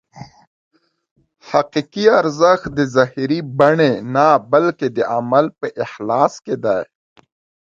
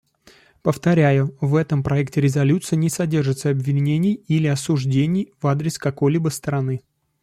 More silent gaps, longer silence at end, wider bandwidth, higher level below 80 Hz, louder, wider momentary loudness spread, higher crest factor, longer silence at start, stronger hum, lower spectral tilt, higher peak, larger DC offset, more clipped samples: first, 0.47-0.71 s, 1.11-1.16 s vs none; first, 0.9 s vs 0.45 s; second, 7.6 kHz vs 13.5 kHz; about the same, -56 dBFS vs -54 dBFS; first, -16 LUFS vs -20 LUFS; first, 9 LU vs 6 LU; about the same, 18 dB vs 16 dB; second, 0.15 s vs 0.65 s; neither; about the same, -6 dB/octave vs -7 dB/octave; first, 0 dBFS vs -4 dBFS; neither; neither